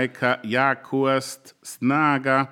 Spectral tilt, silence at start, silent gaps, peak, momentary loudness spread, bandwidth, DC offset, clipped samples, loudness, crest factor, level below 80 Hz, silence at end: -5 dB/octave; 0 s; none; -4 dBFS; 15 LU; 17 kHz; under 0.1%; under 0.1%; -22 LUFS; 18 dB; -78 dBFS; 0.05 s